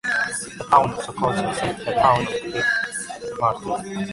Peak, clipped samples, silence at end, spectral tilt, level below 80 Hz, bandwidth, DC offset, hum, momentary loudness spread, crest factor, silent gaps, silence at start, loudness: -2 dBFS; under 0.1%; 0 s; -4 dB/octave; -52 dBFS; 11.5 kHz; under 0.1%; none; 10 LU; 20 dB; none; 0.05 s; -22 LUFS